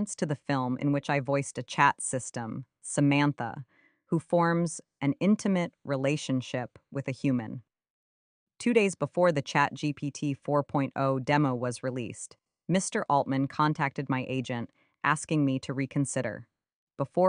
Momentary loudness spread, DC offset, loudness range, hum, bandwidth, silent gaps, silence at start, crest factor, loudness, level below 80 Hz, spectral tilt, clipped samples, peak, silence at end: 12 LU; under 0.1%; 3 LU; none; 10.5 kHz; 7.90-8.47 s, 16.73-16.87 s; 0 s; 22 dB; -29 LUFS; -68 dBFS; -5.5 dB/octave; under 0.1%; -6 dBFS; 0 s